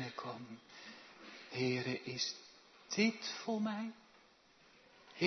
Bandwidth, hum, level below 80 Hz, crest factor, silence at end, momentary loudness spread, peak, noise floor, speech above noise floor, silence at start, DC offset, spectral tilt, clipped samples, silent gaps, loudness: 6.2 kHz; none; -86 dBFS; 24 dB; 0 s; 20 LU; -18 dBFS; -67 dBFS; 29 dB; 0 s; under 0.1%; -3.5 dB/octave; under 0.1%; none; -39 LUFS